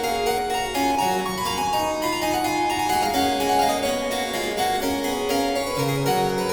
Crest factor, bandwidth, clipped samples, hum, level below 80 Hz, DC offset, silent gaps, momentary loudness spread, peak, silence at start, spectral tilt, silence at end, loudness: 14 dB; over 20 kHz; under 0.1%; none; -46 dBFS; under 0.1%; none; 4 LU; -8 dBFS; 0 s; -3.5 dB/octave; 0 s; -23 LUFS